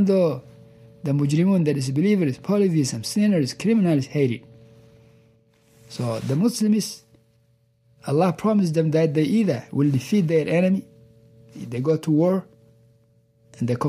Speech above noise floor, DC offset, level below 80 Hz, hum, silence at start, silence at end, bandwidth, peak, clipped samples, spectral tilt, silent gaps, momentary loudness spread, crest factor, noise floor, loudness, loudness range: 42 dB; under 0.1%; -64 dBFS; none; 0 s; 0 s; 15 kHz; -8 dBFS; under 0.1%; -7 dB/octave; none; 10 LU; 14 dB; -62 dBFS; -22 LUFS; 5 LU